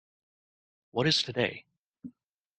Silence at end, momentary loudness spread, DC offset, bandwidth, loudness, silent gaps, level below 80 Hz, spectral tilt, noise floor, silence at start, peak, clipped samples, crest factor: 0.5 s; 24 LU; under 0.1%; 9.2 kHz; -28 LUFS; 1.78-1.94 s; -68 dBFS; -4 dB/octave; -62 dBFS; 0.95 s; -12 dBFS; under 0.1%; 22 dB